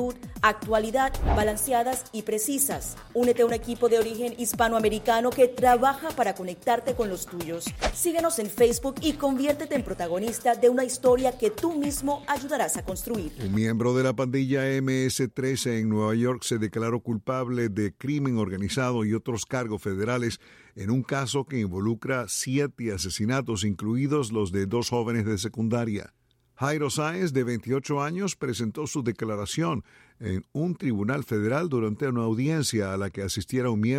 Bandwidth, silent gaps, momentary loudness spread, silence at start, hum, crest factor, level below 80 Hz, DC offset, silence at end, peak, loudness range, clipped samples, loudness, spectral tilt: 16.5 kHz; none; 7 LU; 0 s; none; 20 dB; -44 dBFS; under 0.1%; 0 s; -6 dBFS; 4 LU; under 0.1%; -26 LUFS; -5 dB/octave